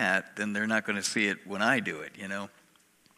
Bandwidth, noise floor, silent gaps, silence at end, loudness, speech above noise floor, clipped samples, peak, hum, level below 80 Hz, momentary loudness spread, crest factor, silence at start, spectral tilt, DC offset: 15.5 kHz; -64 dBFS; none; 0.7 s; -30 LUFS; 34 dB; under 0.1%; -10 dBFS; none; -78 dBFS; 11 LU; 22 dB; 0 s; -3.5 dB/octave; under 0.1%